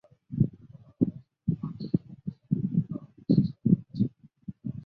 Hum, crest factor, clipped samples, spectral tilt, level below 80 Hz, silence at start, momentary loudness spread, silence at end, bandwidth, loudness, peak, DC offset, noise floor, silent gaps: none; 22 dB; under 0.1%; -12.5 dB/octave; -56 dBFS; 0.3 s; 14 LU; 0 s; 5 kHz; -30 LUFS; -8 dBFS; under 0.1%; -52 dBFS; none